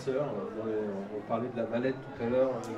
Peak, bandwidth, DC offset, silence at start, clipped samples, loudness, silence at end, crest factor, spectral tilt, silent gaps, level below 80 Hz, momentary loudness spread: -16 dBFS; 11.5 kHz; under 0.1%; 0 s; under 0.1%; -33 LUFS; 0 s; 16 dB; -7.5 dB/octave; none; -64 dBFS; 7 LU